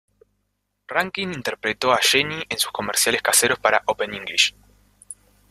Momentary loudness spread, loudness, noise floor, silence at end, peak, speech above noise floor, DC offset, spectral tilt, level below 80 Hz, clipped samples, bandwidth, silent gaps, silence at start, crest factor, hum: 10 LU; -20 LUFS; -74 dBFS; 0.4 s; -2 dBFS; 52 dB; under 0.1%; -1 dB/octave; -58 dBFS; under 0.1%; 15.5 kHz; none; 0.9 s; 22 dB; 50 Hz at -50 dBFS